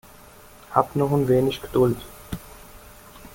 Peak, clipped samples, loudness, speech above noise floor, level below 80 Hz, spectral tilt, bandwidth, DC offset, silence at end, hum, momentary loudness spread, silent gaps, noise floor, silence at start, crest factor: -2 dBFS; under 0.1%; -22 LUFS; 26 dB; -48 dBFS; -7 dB/octave; 17 kHz; under 0.1%; 0.05 s; none; 23 LU; none; -47 dBFS; 0.7 s; 22 dB